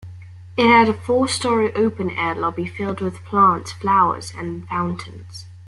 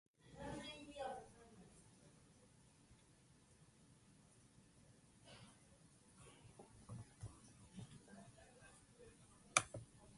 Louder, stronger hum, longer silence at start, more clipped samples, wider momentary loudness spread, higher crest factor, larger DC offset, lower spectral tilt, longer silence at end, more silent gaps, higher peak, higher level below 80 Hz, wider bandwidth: first, -19 LUFS vs -48 LUFS; neither; second, 0 s vs 0.2 s; neither; about the same, 16 LU vs 18 LU; second, 18 dB vs 40 dB; neither; first, -5 dB/octave vs -2.5 dB/octave; about the same, 0 s vs 0 s; neither; first, -2 dBFS vs -16 dBFS; first, -56 dBFS vs -74 dBFS; about the same, 12 kHz vs 11.5 kHz